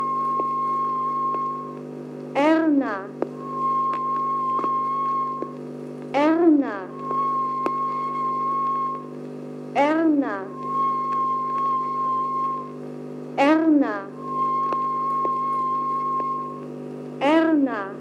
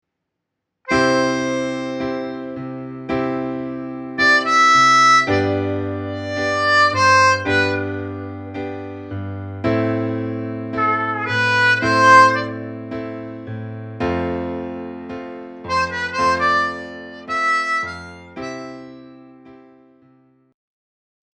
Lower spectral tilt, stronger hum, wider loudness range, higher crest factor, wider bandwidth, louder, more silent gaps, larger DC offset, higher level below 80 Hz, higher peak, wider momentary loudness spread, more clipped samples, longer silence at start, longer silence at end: first, -7 dB/octave vs -4 dB/octave; first, 50 Hz at -45 dBFS vs none; second, 2 LU vs 10 LU; about the same, 16 dB vs 20 dB; second, 9.2 kHz vs 10.5 kHz; second, -23 LUFS vs -17 LUFS; neither; neither; second, -84 dBFS vs -52 dBFS; second, -6 dBFS vs 0 dBFS; about the same, 16 LU vs 18 LU; neither; second, 0 s vs 0.85 s; second, 0 s vs 1.85 s